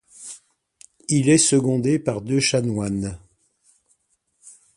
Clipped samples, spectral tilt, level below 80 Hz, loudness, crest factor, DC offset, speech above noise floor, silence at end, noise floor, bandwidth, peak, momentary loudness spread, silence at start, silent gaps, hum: under 0.1%; -4.5 dB/octave; -52 dBFS; -20 LUFS; 18 dB; under 0.1%; 49 dB; 0.25 s; -69 dBFS; 11.5 kHz; -4 dBFS; 22 LU; 0.2 s; none; none